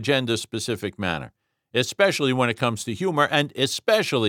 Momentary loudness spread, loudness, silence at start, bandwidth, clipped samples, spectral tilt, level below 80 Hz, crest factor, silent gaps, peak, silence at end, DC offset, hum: 8 LU; -23 LUFS; 0 s; 18 kHz; under 0.1%; -4 dB/octave; -60 dBFS; 18 dB; none; -4 dBFS; 0 s; under 0.1%; none